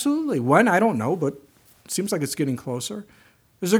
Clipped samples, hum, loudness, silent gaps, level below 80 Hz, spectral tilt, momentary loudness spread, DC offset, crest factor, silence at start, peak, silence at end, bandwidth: under 0.1%; none; -23 LUFS; none; -68 dBFS; -5 dB/octave; 13 LU; under 0.1%; 20 dB; 0 s; -2 dBFS; 0 s; over 20 kHz